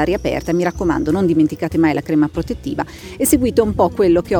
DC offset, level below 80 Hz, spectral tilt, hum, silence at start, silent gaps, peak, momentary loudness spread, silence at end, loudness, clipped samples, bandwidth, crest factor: under 0.1%; -36 dBFS; -6 dB/octave; none; 0 s; none; -2 dBFS; 9 LU; 0 s; -17 LUFS; under 0.1%; over 20 kHz; 16 dB